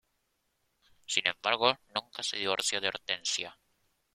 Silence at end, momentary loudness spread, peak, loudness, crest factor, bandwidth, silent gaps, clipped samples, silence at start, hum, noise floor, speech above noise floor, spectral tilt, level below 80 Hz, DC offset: 0.6 s; 8 LU; -6 dBFS; -30 LUFS; 28 dB; 16 kHz; none; under 0.1%; 1.1 s; none; -78 dBFS; 46 dB; -0.5 dB/octave; -74 dBFS; under 0.1%